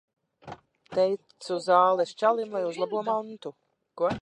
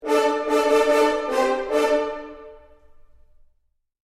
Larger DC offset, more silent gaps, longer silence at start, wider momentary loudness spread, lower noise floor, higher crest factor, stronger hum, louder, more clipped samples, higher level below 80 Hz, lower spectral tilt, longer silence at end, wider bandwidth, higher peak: neither; neither; first, 0.45 s vs 0 s; first, 21 LU vs 11 LU; second, -47 dBFS vs -68 dBFS; about the same, 20 dB vs 16 dB; neither; second, -27 LUFS vs -21 LUFS; neither; second, -66 dBFS vs -54 dBFS; first, -5 dB/octave vs -2.5 dB/octave; second, 0 s vs 1.6 s; second, 11 kHz vs 15 kHz; about the same, -8 dBFS vs -8 dBFS